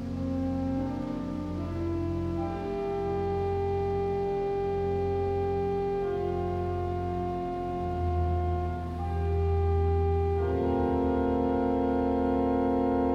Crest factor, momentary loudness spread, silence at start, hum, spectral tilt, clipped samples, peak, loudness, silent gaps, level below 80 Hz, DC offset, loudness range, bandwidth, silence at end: 12 dB; 6 LU; 0 s; none; -9.5 dB/octave; under 0.1%; -16 dBFS; -29 LUFS; none; -38 dBFS; under 0.1%; 4 LU; 6.4 kHz; 0 s